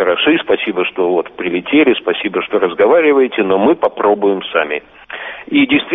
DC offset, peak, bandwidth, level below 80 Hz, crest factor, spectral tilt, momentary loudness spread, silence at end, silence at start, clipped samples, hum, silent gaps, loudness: under 0.1%; 0 dBFS; 3.9 kHz; -54 dBFS; 12 dB; -8 dB/octave; 9 LU; 0 s; 0 s; under 0.1%; none; none; -14 LUFS